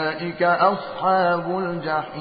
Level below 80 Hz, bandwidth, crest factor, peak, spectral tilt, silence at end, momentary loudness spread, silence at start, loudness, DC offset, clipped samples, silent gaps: -64 dBFS; 5 kHz; 18 dB; -4 dBFS; -10.5 dB/octave; 0 s; 7 LU; 0 s; -21 LUFS; under 0.1%; under 0.1%; none